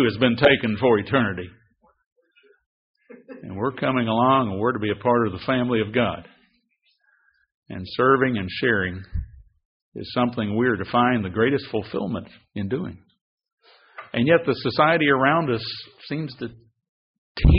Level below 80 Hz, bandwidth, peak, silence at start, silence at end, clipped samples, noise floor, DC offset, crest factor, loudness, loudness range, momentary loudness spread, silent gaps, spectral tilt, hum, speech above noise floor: -38 dBFS; 5.4 kHz; -2 dBFS; 0 s; 0 s; under 0.1%; -68 dBFS; under 0.1%; 22 dB; -22 LUFS; 4 LU; 18 LU; 2.06-2.16 s, 2.66-2.94 s, 7.54-7.62 s, 9.65-9.92 s, 13.21-13.37 s, 13.52-13.58 s, 16.89-17.35 s; -4.5 dB/octave; none; 46 dB